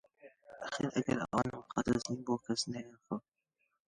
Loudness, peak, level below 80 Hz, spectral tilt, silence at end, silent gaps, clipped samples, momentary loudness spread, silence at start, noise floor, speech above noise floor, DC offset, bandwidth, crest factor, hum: -37 LUFS; -16 dBFS; -62 dBFS; -5 dB/octave; 0.7 s; none; under 0.1%; 10 LU; 0.25 s; -82 dBFS; 46 dB; under 0.1%; 11.5 kHz; 22 dB; none